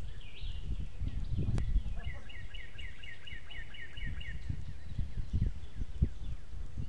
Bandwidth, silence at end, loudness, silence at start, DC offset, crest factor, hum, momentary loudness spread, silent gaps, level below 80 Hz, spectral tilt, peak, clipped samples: 10 kHz; 0 s; -41 LUFS; 0 s; 2%; 22 dB; none; 11 LU; none; -40 dBFS; -6.5 dB/octave; -16 dBFS; under 0.1%